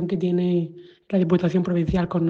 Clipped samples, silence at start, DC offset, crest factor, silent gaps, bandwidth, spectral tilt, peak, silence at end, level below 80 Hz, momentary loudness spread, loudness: under 0.1%; 0 s; under 0.1%; 16 dB; none; 6.6 kHz; -9.5 dB/octave; -6 dBFS; 0 s; -44 dBFS; 6 LU; -22 LUFS